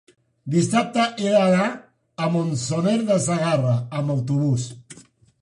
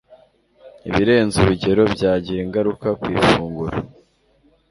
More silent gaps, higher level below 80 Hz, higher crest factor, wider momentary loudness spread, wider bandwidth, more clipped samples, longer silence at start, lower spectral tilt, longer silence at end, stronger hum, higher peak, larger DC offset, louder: neither; second, -60 dBFS vs -40 dBFS; about the same, 16 dB vs 18 dB; about the same, 11 LU vs 10 LU; about the same, 11 kHz vs 11.5 kHz; neither; first, 0.45 s vs 0.1 s; about the same, -6 dB/octave vs -6 dB/octave; second, 0.4 s vs 0.85 s; neither; second, -6 dBFS vs -2 dBFS; neither; second, -21 LUFS vs -18 LUFS